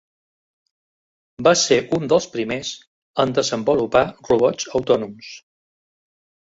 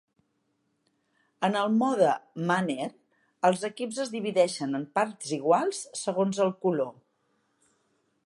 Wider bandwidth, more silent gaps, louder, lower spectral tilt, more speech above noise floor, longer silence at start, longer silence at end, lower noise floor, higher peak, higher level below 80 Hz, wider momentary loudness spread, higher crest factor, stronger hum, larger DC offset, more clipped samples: second, 8 kHz vs 11.5 kHz; first, 2.87-3.14 s vs none; first, -19 LUFS vs -28 LUFS; about the same, -4 dB/octave vs -5 dB/octave; first, over 71 dB vs 48 dB; about the same, 1.4 s vs 1.4 s; second, 1.1 s vs 1.35 s; first, under -90 dBFS vs -75 dBFS; first, -2 dBFS vs -10 dBFS; first, -56 dBFS vs -82 dBFS; first, 14 LU vs 8 LU; about the same, 20 dB vs 20 dB; neither; neither; neither